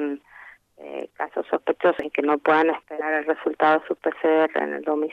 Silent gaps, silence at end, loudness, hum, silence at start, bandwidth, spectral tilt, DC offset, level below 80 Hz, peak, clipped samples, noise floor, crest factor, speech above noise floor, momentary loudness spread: none; 0 s; -23 LUFS; none; 0 s; 5.6 kHz; -6.5 dB/octave; under 0.1%; -70 dBFS; -6 dBFS; under 0.1%; -48 dBFS; 16 dB; 26 dB; 11 LU